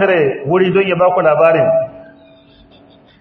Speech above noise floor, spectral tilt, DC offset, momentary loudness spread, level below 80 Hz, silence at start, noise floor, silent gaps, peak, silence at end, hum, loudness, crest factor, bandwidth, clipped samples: 33 dB; -9 dB/octave; under 0.1%; 5 LU; -56 dBFS; 0 s; -45 dBFS; none; 0 dBFS; 1.15 s; none; -13 LUFS; 14 dB; 4.4 kHz; under 0.1%